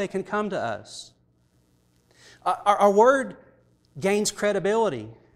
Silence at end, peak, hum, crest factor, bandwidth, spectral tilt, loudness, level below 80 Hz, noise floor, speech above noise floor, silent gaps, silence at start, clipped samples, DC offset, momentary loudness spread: 0.2 s; -6 dBFS; 60 Hz at -65 dBFS; 20 dB; 15.5 kHz; -4 dB/octave; -23 LUFS; -62 dBFS; -64 dBFS; 41 dB; none; 0 s; under 0.1%; under 0.1%; 18 LU